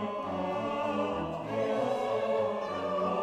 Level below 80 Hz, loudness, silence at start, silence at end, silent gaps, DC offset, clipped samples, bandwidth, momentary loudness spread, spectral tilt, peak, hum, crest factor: -64 dBFS; -32 LUFS; 0 s; 0 s; none; under 0.1%; under 0.1%; 11.5 kHz; 4 LU; -6.5 dB/octave; -18 dBFS; none; 14 dB